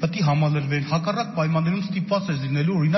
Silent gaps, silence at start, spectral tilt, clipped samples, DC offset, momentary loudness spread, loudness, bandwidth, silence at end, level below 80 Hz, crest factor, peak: none; 0 s; -6.5 dB/octave; under 0.1%; under 0.1%; 4 LU; -23 LUFS; 6.2 kHz; 0 s; -58 dBFS; 12 dB; -10 dBFS